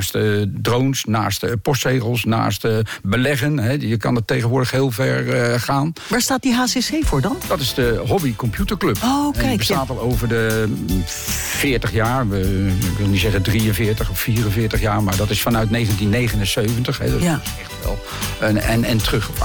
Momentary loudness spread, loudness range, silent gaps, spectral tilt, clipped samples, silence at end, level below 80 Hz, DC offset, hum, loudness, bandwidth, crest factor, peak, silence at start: 3 LU; 1 LU; none; -5 dB/octave; under 0.1%; 0 s; -30 dBFS; under 0.1%; none; -19 LUFS; 19 kHz; 10 dB; -8 dBFS; 0 s